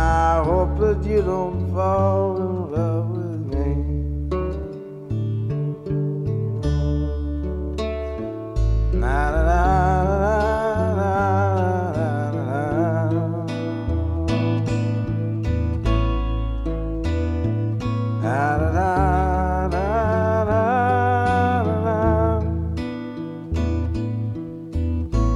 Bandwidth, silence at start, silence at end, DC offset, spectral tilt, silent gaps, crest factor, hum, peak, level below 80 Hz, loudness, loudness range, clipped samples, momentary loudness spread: 10.5 kHz; 0 s; 0 s; under 0.1%; -8.5 dB/octave; none; 16 dB; none; -6 dBFS; -28 dBFS; -22 LUFS; 5 LU; under 0.1%; 8 LU